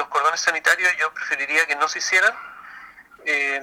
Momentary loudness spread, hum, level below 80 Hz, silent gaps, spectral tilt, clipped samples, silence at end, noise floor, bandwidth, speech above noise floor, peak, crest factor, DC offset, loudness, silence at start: 19 LU; none; -70 dBFS; none; 1 dB/octave; under 0.1%; 0 s; -44 dBFS; 17 kHz; 23 dB; -2 dBFS; 20 dB; under 0.1%; -19 LUFS; 0 s